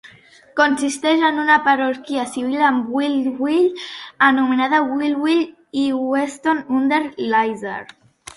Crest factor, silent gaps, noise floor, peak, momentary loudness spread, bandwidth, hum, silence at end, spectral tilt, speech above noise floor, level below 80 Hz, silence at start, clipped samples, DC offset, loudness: 18 dB; none; -47 dBFS; -2 dBFS; 9 LU; 11.5 kHz; none; 0.5 s; -3.5 dB/octave; 29 dB; -64 dBFS; 0.05 s; under 0.1%; under 0.1%; -18 LUFS